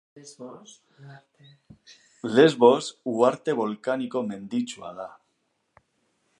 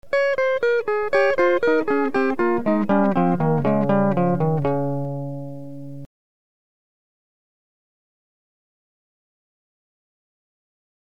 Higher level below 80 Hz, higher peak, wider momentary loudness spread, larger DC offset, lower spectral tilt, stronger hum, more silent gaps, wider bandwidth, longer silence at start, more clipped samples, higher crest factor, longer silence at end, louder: second, -74 dBFS vs -60 dBFS; about the same, -4 dBFS vs -6 dBFS; first, 23 LU vs 15 LU; second, under 0.1% vs 2%; second, -5.5 dB/octave vs -8.5 dB/octave; neither; neither; first, 10.5 kHz vs 8.6 kHz; first, 0.15 s vs 0 s; neither; first, 24 dB vs 16 dB; second, 1.3 s vs 4.95 s; second, -23 LUFS vs -20 LUFS